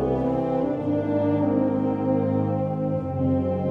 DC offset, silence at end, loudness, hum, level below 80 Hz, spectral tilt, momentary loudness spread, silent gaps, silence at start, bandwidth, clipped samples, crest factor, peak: under 0.1%; 0 s; -24 LUFS; none; -48 dBFS; -11 dB/octave; 3 LU; none; 0 s; 4.7 kHz; under 0.1%; 12 dB; -10 dBFS